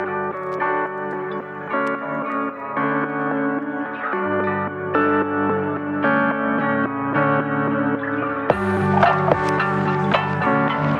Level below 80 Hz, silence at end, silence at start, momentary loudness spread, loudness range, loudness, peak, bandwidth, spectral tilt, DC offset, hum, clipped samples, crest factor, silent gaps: -56 dBFS; 0 s; 0 s; 7 LU; 4 LU; -21 LUFS; -2 dBFS; 10 kHz; -8 dB/octave; under 0.1%; none; under 0.1%; 18 dB; none